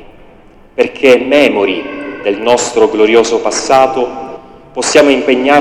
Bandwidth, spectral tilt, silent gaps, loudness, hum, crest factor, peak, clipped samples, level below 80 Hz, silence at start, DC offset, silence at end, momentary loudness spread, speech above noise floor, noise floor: 15 kHz; -3 dB/octave; none; -10 LUFS; none; 10 dB; 0 dBFS; 1%; -46 dBFS; 0 s; under 0.1%; 0 s; 13 LU; 30 dB; -39 dBFS